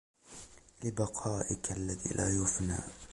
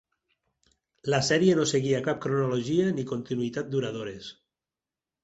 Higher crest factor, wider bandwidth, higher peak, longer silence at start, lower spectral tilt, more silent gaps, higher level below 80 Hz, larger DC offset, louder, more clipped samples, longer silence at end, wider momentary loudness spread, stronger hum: about the same, 18 dB vs 18 dB; first, 11.5 kHz vs 8.2 kHz; second, -18 dBFS vs -10 dBFS; second, 0.25 s vs 1.05 s; about the same, -5 dB/octave vs -5 dB/octave; neither; first, -50 dBFS vs -64 dBFS; neither; second, -34 LUFS vs -27 LUFS; neither; second, 0 s vs 0.9 s; first, 20 LU vs 15 LU; neither